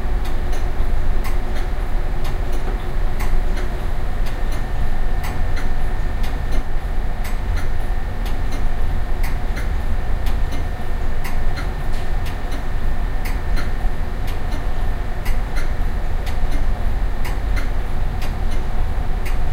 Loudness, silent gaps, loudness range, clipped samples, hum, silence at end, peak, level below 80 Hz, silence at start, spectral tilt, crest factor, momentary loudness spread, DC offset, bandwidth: -26 LUFS; none; 1 LU; under 0.1%; none; 0 s; -4 dBFS; -18 dBFS; 0 s; -6 dB/octave; 12 dB; 2 LU; under 0.1%; 12 kHz